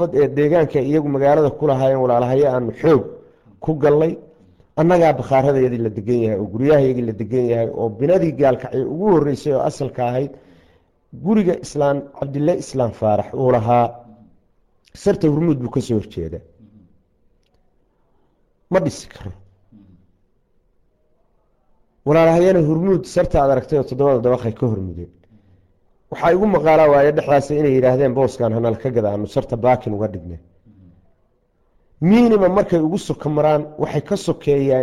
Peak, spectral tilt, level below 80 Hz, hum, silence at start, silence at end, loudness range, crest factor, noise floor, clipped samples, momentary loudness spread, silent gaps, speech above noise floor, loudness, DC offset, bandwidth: -6 dBFS; -8 dB/octave; -44 dBFS; none; 0 s; 0 s; 11 LU; 12 dB; -61 dBFS; under 0.1%; 10 LU; none; 45 dB; -17 LUFS; under 0.1%; 12 kHz